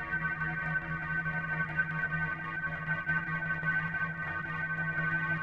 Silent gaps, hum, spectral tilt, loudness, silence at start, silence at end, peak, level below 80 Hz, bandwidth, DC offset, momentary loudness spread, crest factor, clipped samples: none; none; -7.5 dB/octave; -33 LUFS; 0 s; 0 s; -18 dBFS; -54 dBFS; 5.6 kHz; under 0.1%; 4 LU; 14 dB; under 0.1%